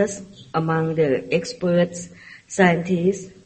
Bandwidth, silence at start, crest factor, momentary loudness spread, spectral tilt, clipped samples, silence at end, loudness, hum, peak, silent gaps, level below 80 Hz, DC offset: 8.8 kHz; 0 s; 20 dB; 13 LU; -6 dB/octave; under 0.1%; 0.15 s; -21 LUFS; none; -2 dBFS; none; -56 dBFS; under 0.1%